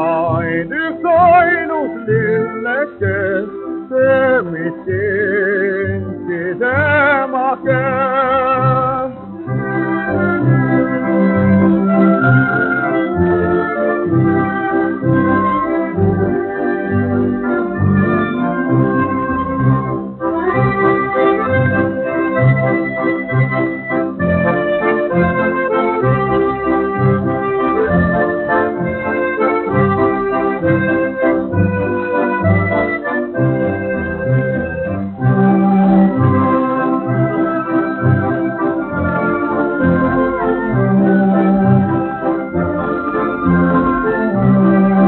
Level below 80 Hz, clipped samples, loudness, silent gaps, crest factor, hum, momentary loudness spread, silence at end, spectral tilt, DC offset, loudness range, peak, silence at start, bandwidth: -42 dBFS; under 0.1%; -15 LUFS; none; 14 dB; none; 6 LU; 0 s; -7.5 dB/octave; under 0.1%; 3 LU; 0 dBFS; 0 s; 4.2 kHz